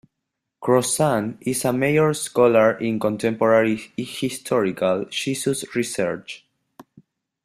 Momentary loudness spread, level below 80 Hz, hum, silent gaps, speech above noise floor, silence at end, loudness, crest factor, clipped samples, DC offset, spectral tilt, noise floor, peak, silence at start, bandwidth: 10 LU; -62 dBFS; none; none; 60 dB; 1.1 s; -21 LUFS; 18 dB; under 0.1%; under 0.1%; -4.5 dB/octave; -81 dBFS; -4 dBFS; 0.6 s; 15.5 kHz